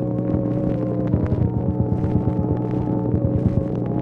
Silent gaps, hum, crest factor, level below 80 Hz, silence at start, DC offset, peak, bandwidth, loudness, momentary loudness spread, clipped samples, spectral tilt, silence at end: none; none; 14 dB; -34 dBFS; 0 s; under 0.1%; -6 dBFS; 3.5 kHz; -22 LUFS; 2 LU; under 0.1%; -12 dB/octave; 0 s